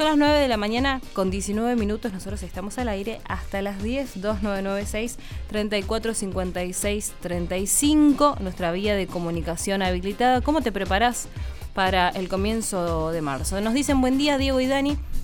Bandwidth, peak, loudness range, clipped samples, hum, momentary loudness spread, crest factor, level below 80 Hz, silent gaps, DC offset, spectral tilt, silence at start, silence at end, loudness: 19.5 kHz; -6 dBFS; 5 LU; under 0.1%; none; 10 LU; 18 dB; -36 dBFS; none; under 0.1%; -4.5 dB/octave; 0 s; 0 s; -24 LUFS